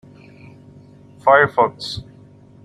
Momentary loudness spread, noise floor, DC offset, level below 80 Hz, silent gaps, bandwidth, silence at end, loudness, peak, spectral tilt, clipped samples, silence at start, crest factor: 16 LU; -45 dBFS; under 0.1%; -56 dBFS; none; 12 kHz; 0.6 s; -17 LUFS; -2 dBFS; -5 dB/octave; under 0.1%; 1.25 s; 20 dB